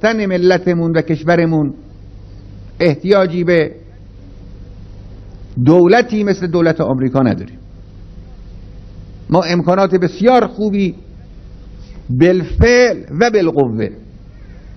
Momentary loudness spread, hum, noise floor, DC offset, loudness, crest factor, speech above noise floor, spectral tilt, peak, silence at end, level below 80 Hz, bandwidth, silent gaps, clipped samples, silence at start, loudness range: 12 LU; none; -36 dBFS; under 0.1%; -13 LUFS; 14 dB; 23 dB; -7 dB/octave; 0 dBFS; 0 s; -32 dBFS; 6.4 kHz; none; 0.1%; 0 s; 3 LU